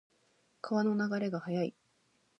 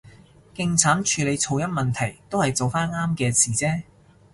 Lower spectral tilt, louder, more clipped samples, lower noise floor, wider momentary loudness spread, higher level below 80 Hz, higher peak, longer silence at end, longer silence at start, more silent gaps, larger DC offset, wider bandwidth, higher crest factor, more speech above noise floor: first, -7.5 dB/octave vs -4 dB/octave; second, -34 LUFS vs -22 LUFS; neither; first, -73 dBFS vs -49 dBFS; about the same, 7 LU vs 8 LU; second, -84 dBFS vs -52 dBFS; second, -20 dBFS vs -2 dBFS; first, 0.7 s vs 0.5 s; first, 0.65 s vs 0.05 s; neither; neither; second, 8.2 kHz vs 11.5 kHz; second, 16 dB vs 22 dB; first, 40 dB vs 27 dB